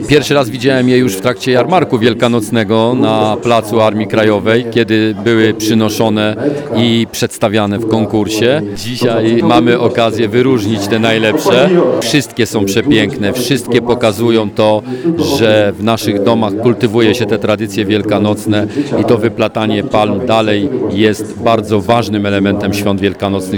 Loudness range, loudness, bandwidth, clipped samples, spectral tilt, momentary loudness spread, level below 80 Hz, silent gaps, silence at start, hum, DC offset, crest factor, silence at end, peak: 2 LU; -12 LUFS; 19.5 kHz; 0.2%; -5.5 dB/octave; 4 LU; -46 dBFS; none; 0 s; none; under 0.1%; 12 dB; 0 s; 0 dBFS